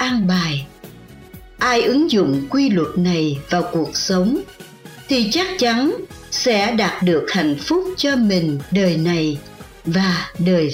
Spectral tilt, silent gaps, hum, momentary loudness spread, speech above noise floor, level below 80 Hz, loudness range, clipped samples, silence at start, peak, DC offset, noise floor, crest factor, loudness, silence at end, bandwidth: -5 dB/octave; none; none; 8 LU; 22 dB; -48 dBFS; 1 LU; under 0.1%; 0 s; -6 dBFS; under 0.1%; -40 dBFS; 12 dB; -18 LUFS; 0 s; 16 kHz